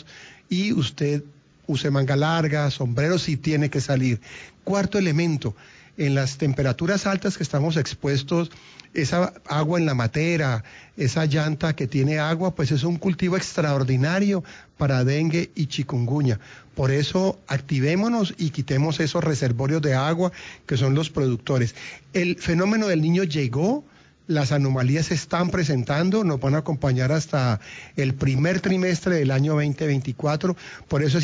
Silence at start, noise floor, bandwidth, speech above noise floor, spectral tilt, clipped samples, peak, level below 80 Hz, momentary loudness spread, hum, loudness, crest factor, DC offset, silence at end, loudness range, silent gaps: 0.1 s; -46 dBFS; 7.8 kHz; 24 dB; -6.5 dB/octave; under 0.1%; -10 dBFS; -50 dBFS; 6 LU; none; -23 LUFS; 12 dB; under 0.1%; 0 s; 1 LU; none